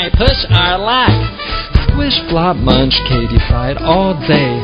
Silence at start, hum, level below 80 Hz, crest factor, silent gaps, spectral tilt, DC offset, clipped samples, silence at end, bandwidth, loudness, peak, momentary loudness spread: 0 s; none; -18 dBFS; 12 dB; none; -8 dB/octave; under 0.1%; 0.3%; 0 s; 8 kHz; -12 LUFS; 0 dBFS; 5 LU